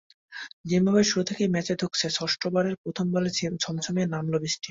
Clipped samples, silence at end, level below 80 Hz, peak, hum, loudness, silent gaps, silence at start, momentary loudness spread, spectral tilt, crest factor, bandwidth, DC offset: under 0.1%; 0 s; -62 dBFS; -10 dBFS; none; -26 LUFS; 0.53-0.64 s, 2.78-2.84 s; 0.3 s; 8 LU; -4.5 dB/octave; 18 dB; 7.8 kHz; under 0.1%